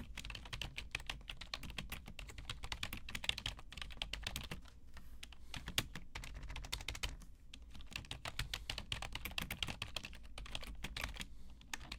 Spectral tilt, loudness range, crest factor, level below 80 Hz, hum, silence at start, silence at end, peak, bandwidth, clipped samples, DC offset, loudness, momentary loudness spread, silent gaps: -2.5 dB/octave; 2 LU; 32 dB; -52 dBFS; none; 0 s; 0 s; -14 dBFS; 17.5 kHz; under 0.1%; under 0.1%; -46 LUFS; 14 LU; none